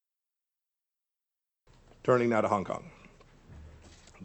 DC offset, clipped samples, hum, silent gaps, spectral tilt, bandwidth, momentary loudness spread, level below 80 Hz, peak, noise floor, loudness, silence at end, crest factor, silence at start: under 0.1%; under 0.1%; none; none; -7 dB/octave; 8.6 kHz; 24 LU; -60 dBFS; -12 dBFS; -90 dBFS; -29 LUFS; 0 s; 24 dB; 2.05 s